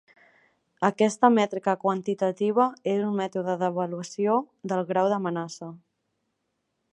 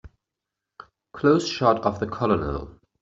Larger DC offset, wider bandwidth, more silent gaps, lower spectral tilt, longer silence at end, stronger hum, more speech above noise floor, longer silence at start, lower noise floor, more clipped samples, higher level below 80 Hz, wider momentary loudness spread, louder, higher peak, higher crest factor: neither; first, 11 kHz vs 7.8 kHz; neither; about the same, -6 dB/octave vs -5 dB/octave; first, 1.15 s vs 0.3 s; neither; second, 53 dB vs 63 dB; first, 0.8 s vs 0.05 s; second, -78 dBFS vs -85 dBFS; neither; second, -78 dBFS vs -46 dBFS; second, 10 LU vs 16 LU; about the same, -25 LUFS vs -23 LUFS; about the same, -4 dBFS vs -4 dBFS; about the same, 22 dB vs 20 dB